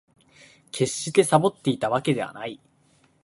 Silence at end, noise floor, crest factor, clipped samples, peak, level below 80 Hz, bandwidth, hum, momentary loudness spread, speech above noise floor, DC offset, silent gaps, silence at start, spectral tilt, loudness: 0.65 s; -62 dBFS; 24 dB; under 0.1%; -2 dBFS; -64 dBFS; 12 kHz; none; 17 LU; 39 dB; under 0.1%; none; 0.75 s; -5 dB/octave; -23 LUFS